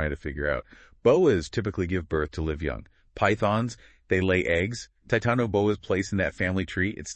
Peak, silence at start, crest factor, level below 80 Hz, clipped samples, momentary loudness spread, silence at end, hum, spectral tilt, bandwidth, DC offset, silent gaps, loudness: -8 dBFS; 0 s; 18 dB; -44 dBFS; under 0.1%; 9 LU; 0 s; none; -6 dB/octave; 8.6 kHz; under 0.1%; none; -26 LUFS